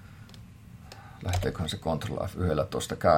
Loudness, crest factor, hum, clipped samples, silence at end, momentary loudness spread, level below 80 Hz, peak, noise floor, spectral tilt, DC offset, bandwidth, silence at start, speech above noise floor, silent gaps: -31 LUFS; 22 dB; none; under 0.1%; 0 s; 20 LU; -48 dBFS; -8 dBFS; -48 dBFS; -5.5 dB/octave; under 0.1%; 16.5 kHz; 0 s; 20 dB; none